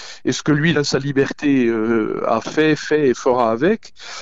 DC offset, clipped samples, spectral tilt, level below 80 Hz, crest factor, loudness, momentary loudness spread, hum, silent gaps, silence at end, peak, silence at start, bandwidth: 0.9%; under 0.1%; -5.5 dB/octave; -52 dBFS; 12 dB; -18 LUFS; 4 LU; none; none; 0 s; -4 dBFS; 0 s; 8 kHz